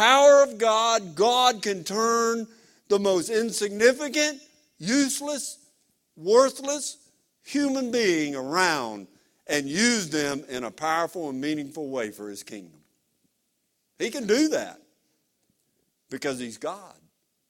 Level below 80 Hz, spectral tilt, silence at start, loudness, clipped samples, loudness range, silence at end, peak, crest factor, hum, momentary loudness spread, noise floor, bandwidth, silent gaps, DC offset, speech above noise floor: -70 dBFS; -2.5 dB/octave; 0 s; -24 LUFS; under 0.1%; 7 LU; 0.6 s; -4 dBFS; 22 dB; none; 15 LU; -75 dBFS; 16.5 kHz; none; under 0.1%; 50 dB